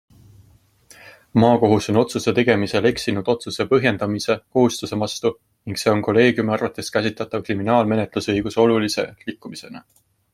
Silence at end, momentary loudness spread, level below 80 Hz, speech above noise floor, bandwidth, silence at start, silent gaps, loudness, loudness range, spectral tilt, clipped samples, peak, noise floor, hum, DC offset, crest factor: 0.55 s; 12 LU; -54 dBFS; 35 dB; 15.5 kHz; 1.05 s; none; -20 LUFS; 3 LU; -5.5 dB/octave; under 0.1%; -2 dBFS; -54 dBFS; none; under 0.1%; 20 dB